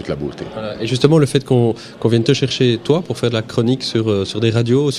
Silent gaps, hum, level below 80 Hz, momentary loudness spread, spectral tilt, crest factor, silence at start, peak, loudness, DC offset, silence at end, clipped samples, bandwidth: none; none; -48 dBFS; 10 LU; -6.5 dB/octave; 16 dB; 0 s; 0 dBFS; -17 LUFS; under 0.1%; 0 s; under 0.1%; 12.5 kHz